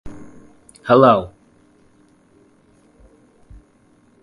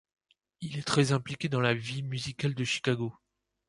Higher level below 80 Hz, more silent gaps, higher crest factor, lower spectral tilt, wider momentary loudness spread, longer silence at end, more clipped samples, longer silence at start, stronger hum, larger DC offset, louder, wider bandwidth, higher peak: first, -50 dBFS vs -64 dBFS; neither; about the same, 22 dB vs 22 dB; first, -7.5 dB/octave vs -5 dB/octave; first, 29 LU vs 10 LU; first, 2.95 s vs 0.55 s; neither; second, 0.05 s vs 0.6 s; neither; neither; first, -14 LUFS vs -30 LUFS; about the same, 11.5 kHz vs 11.5 kHz; first, 0 dBFS vs -10 dBFS